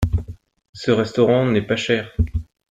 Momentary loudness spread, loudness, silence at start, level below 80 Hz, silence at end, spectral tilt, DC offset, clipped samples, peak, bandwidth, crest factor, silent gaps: 11 LU; -20 LUFS; 0 s; -32 dBFS; 0.25 s; -6.5 dB/octave; under 0.1%; under 0.1%; -2 dBFS; 9.4 kHz; 18 dB; 0.69-0.73 s